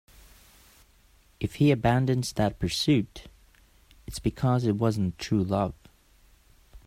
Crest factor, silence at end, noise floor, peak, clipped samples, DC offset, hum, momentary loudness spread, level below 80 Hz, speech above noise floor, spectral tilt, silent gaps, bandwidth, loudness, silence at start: 20 dB; 0.1 s; -60 dBFS; -8 dBFS; under 0.1%; under 0.1%; none; 12 LU; -48 dBFS; 34 dB; -6.5 dB/octave; none; 15.5 kHz; -26 LUFS; 1.4 s